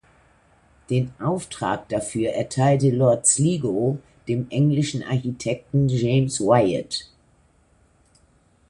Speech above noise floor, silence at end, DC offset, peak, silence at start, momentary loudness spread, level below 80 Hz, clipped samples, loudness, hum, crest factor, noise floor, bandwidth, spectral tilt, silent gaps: 38 dB; 1.65 s; under 0.1%; -4 dBFS; 0.9 s; 9 LU; -54 dBFS; under 0.1%; -22 LUFS; none; 20 dB; -59 dBFS; 11.5 kHz; -5.5 dB/octave; none